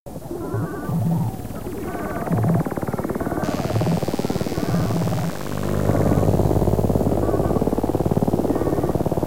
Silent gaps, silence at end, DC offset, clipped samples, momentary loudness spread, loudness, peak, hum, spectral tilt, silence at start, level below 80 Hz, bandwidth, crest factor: 0.00-0.06 s; 0 s; 2%; under 0.1%; 8 LU; -22 LUFS; -4 dBFS; none; -7.5 dB/octave; 0 s; -34 dBFS; 16 kHz; 16 dB